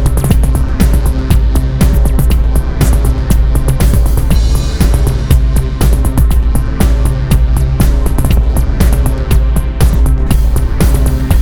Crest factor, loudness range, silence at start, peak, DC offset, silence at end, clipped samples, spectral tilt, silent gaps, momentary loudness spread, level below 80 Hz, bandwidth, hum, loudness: 8 dB; 0 LU; 0 s; 0 dBFS; under 0.1%; 0 s; 0.3%; -6.5 dB/octave; none; 2 LU; -10 dBFS; 18.5 kHz; none; -12 LUFS